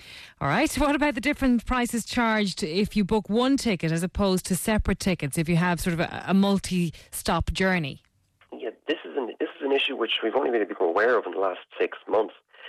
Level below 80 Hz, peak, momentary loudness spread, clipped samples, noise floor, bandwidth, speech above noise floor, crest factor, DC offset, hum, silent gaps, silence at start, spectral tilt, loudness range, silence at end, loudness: -42 dBFS; -12 dBFS; 8 LU; under 0.1%; -50 dBFS; 14 kHz; 26 dB; 14 dB; under 0.1%; none; none; 0 s; -5 dB/octave; 3 LU; 0 s; -25 LUFS